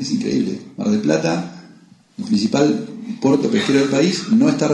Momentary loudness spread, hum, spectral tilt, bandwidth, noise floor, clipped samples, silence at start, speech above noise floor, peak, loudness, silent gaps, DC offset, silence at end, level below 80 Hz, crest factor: 9 LU; none; -5.5 dB/octave; 10.5 kHz; -47 dBFS; under 0.1%; 0 s; 30 dB; -2 dBFS; -18 LUFS; none; under 0.1%; 0 s; -60 dBFS; 16 dB